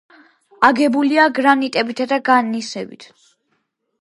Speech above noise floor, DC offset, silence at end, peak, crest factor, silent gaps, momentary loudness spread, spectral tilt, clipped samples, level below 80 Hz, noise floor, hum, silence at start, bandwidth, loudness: 53 dB; under 0.1%; 1 s; 0 dBFS; 18 dB; none; 13 LU; -4 dB/octave; under 0.1%; -66 dBFS; -69 dBFS; none; 0.6 s; 11.5 kHz; -16 LUFS